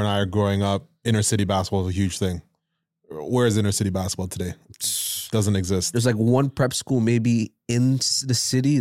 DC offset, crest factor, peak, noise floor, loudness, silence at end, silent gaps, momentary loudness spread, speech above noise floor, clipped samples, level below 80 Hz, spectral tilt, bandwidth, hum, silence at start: under 0.1%; 14 dB; -8 dBFS; -77 dBFS; -22 LUFS; 0 s; none; 8 LU; 55 dB; under 0.1%; -56 dBFS; -5 dB/octave; 16.5 kHz; none; 0 s